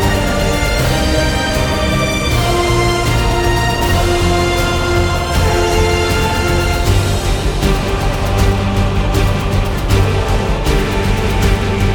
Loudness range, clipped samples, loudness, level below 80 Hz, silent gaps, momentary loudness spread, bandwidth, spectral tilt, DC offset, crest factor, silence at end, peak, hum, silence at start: 1 LU; under 0.1%; -15 LUFS; -18 dBFS; none; 3 LU; 19 kHz; -5 dB/octave; under 0.1%; 12 dB; 0 s; 0 dBFS; none; 0 s